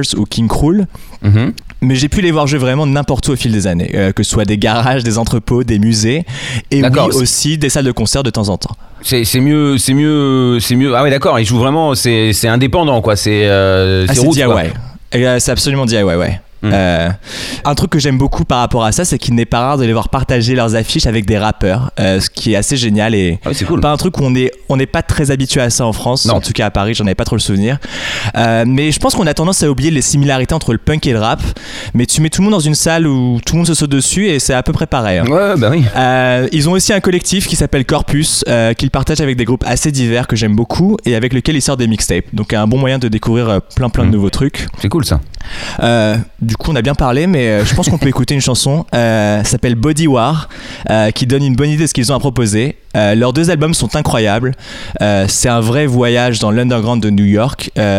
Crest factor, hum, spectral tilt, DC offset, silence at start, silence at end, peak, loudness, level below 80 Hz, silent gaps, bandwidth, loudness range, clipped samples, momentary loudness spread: 12 dB; none; -5 dB/octave; 0.6%; 0 s; 0 s; 0 dBFS; -12 LUFS; -28 dBFS; none; 16 kHz; 2 LU; under 0.1%; 5 LU